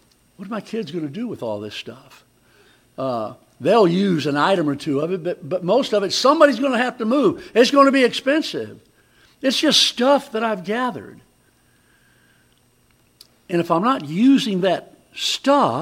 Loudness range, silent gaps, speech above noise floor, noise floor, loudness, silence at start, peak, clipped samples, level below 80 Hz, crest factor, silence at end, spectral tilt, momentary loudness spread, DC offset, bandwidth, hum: 11 LU; none; 40 dB; -59 dBFS; -19 LUFS; 0.4 s; -2 dBFS; under 0.1%; -66 dBFS; 20 dB; 0 s; -4.5 dB/octave; 14 LU; under 0.1%; 16 kHz; none